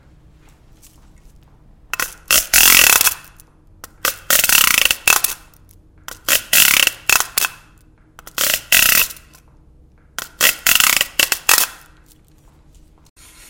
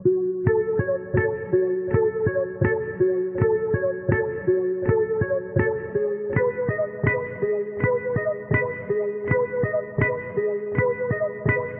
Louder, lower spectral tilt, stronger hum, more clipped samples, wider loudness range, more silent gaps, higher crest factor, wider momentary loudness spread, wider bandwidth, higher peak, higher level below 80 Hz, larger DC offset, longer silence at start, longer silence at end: first, -12 LUFS vs -24 LUFS; second, 1.5 dB/octave vs -9.5 dB/octave; neither; first, 0.2% vs under 0.1%; first, 4 LU vs 1 LU; neither; about the same, 18 dB vs 16 dB; first, 15 LU vs 3 LU; first, over 20 kHz vs 3.3 kHz; first, 0 dBFS vs -6 dBFS; about the same, -44 dBFS vs -48 dBFS; neither; first, 1.95 s vs 0 s; first, 1.75 s vs 0 s